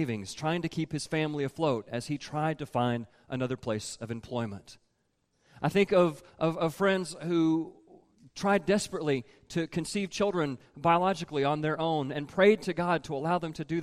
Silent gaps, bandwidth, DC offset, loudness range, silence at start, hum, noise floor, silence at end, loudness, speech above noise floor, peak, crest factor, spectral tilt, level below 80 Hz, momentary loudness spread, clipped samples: none; 15 kHz; under 0.1%; 6 LU; 0 s; none; -75 dBFS; 0 s; -30 LUFS; 46 dB; -10 dBFS; 20 dB; -5.5 dB/octave; -64 dBFS; 10 LU; under 0.1%